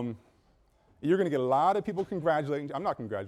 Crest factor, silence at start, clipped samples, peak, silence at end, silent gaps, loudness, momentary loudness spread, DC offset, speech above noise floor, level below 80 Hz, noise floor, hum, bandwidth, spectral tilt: 16 dB; 0 s; under 0.1%; -14 dBFS; 0 s; none; -29 LUFS; 10 LU; under 0.1%; 37 dB; -68 dBFS; -65 dBFS; none; 12 kHz; -7.5 dB/octave